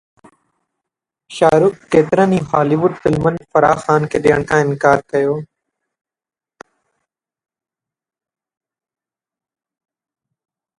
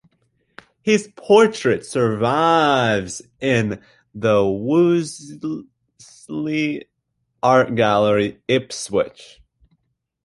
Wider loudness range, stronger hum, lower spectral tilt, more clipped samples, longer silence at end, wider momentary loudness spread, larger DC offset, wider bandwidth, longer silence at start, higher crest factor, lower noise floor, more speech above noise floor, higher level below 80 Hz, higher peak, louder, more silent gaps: first, 7 LU vs 4 LU; neither; first, -7 dB/octave vs -5.5 dB/octave; neither; first, 5.35 s vs 1 s; second, 5 LU vs 14 LU; neither; about the same, 11.5 kHz vs 11.5 kHz; first, 1.3 s vs 0.85 s; about the same, 18 dB vs 18 dB; first, under -90 dBFS vs -73 dBFS; first, over 76 dB vs 54 dB; first, -48 dBFS vs -54 dBFS; about the same, 0 dBFS vs -2 dBFS; first, -15 LUFS vs -19 LUFS; neither